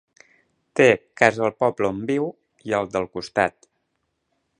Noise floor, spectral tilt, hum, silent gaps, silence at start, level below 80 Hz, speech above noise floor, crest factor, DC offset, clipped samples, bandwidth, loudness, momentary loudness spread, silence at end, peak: -74 dBFS; -5.5 dB/octave; none; none; 0.75 s; -60 dBFS; 53 dB; 24 dB; under 0.1%; under 0.1%; 10.5 kHz; -22 LUFS; 10 LU; 1.1 s; 0 dBFS